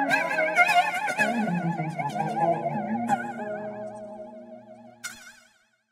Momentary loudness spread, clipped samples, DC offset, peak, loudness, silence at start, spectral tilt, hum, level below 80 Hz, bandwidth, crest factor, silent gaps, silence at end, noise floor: 21 LU; under 0.1%; under 0.1%; -6 dBFS; -25 LUFS; 0 s; -5 dB/octave; none; -76 dBFS; 16 kHz; 22 dB; none; 0.6 s; -62 dBFS